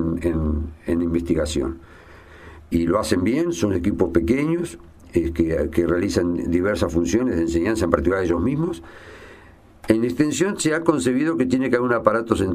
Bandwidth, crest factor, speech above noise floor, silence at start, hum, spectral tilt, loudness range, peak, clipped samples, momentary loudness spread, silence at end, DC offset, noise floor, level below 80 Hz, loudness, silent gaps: 15 kHz; 22 dB; 27 dB; 0 s; none; -6 dB/octave; 2 LU; 0 dBFS; under 0.1%; 6 LU; 0 s; under 0.1%; -47 dBFS; -36 dBFS; -21 LUFS; none